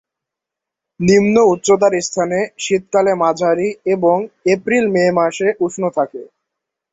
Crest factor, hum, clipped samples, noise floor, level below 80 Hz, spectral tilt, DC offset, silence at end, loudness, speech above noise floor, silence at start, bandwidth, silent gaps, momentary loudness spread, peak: 16 dB; none; under 0.1%; -84 dBFS; -54 dBFS; -5 dB/octave; under 0.1%; 0.65 s; -15 LUFS; 69 dB; 1 s; 8 kHz; none; 7 LU; 0 dBFS